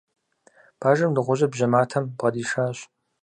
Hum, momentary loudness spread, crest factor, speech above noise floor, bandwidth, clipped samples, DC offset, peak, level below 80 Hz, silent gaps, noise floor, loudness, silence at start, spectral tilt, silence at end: none; 6 LU; 20 dB; 36 dB; 10 kHz; under 0.1%; under 0.1%; -4 dBFS; -68 dBFS; none; -58 dBFS; -23 LUFS; 0.8 s; -6.5 dB/octave; 0.4 s